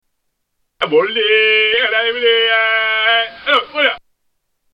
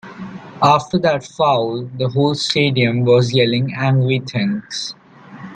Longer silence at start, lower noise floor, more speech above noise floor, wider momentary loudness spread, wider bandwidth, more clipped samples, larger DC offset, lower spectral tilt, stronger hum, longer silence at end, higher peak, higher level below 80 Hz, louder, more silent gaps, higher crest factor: first, 0.8 s vs 0.05 s; first, -70 dBFS vs -37 dBFS; first, 55 dB vs 21 dB; second, 5 LU vs 12 LU; second, 5.6 kHz vs 9.2 kHz; neither; neither; second, -3.5 dB/octave vs -6 dB/octave; neither; first, 0.75 s vs 0 s; about the same, -2 dBFS vs 0 dBFS; second, -62 dBFS vs -56 dBFS; first, -13 LUFS vs -17 LUFS; neither; about the same, 14 dB vs 18 dB